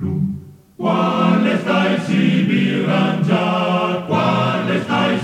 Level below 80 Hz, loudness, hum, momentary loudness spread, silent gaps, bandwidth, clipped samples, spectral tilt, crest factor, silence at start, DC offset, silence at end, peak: -54 dBFS; -17 LUFS; none; 5 LU; none; 9.6 kHz; under 0.1%; -7 dB/octave; 14 dB; 0 s; under 0.1%; 0 s; -4 dBFS